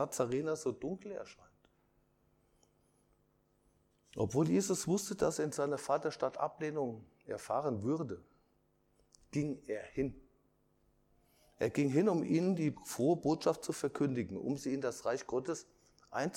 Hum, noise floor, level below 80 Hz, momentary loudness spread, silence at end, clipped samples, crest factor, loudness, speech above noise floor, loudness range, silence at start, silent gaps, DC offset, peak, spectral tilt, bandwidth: none; -74 dBFS; -68 dBFS; 12 LU; 0 s; under 0.1%; 20 dB; -36 LUFS; 39 dB; 10 LU; 0 s; none; under 0.1%; -16 dBFS; -6 dB/octave; 16.5 kHz